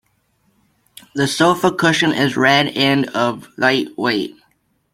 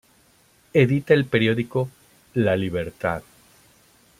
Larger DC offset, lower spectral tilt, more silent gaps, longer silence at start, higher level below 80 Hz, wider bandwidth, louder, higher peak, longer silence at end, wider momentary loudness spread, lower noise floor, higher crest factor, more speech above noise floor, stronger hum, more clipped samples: neither; second, -4.5 dB/octave vs -7.5 dB/octave; neither; first, 1.15 s vs 0.75 s; about the same, -58 dBFS vs -56 dBFS; about the same, 16.5 kHz vs 15.5 kHz; first, -16 LUFS vs -22 LUFS; about the same, -2 dBFS vs -4 dBFS; second, 0.65 s vs 1 s; about the same, 8 LU vs 10 LU; first, -63 dBFS vs -58 dBFS; about the same, 16 dB vs 20 dB; first, 46 dB vs 37 dB; neither; neither